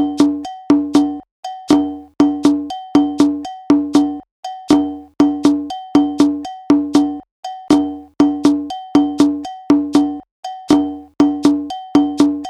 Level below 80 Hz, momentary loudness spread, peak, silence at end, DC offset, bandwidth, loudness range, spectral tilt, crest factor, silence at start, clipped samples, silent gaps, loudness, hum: -50 dBFS; 12 LU; 0 dBFS; 0 s; under 0.1%; 11 kHz; 0 LU; -5.5 dB/octave; 16 dB; 0 s; under 0.1%; 1.31-1.43 s, 4.31-4.43 s, 7.31-7.43 s, 10.31-10.43 s; -16 LUFS; none